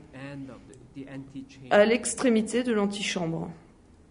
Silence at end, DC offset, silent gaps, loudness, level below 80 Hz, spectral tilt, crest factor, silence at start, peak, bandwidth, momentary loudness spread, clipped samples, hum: 0.5 s; under 0.1%; none; -25 LUFS; -60 dBFS; -4.5 dB/octave; 22 dB; 0.05 s; -6 dBFS; 11 kHz; 22 LU; under 0.1%; none